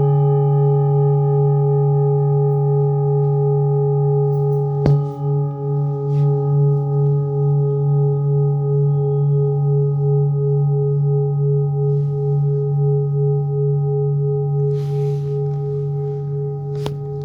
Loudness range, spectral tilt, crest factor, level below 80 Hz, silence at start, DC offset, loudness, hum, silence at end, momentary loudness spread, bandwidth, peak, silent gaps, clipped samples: 3 LU; -12 dB/octave; 16 dB; -50 dBFS; 0 s; under 0.1%; -18 LUFS; none; 0 s; 6 LU; 1.8 kHz; 0 dBFS; none; under 0.1%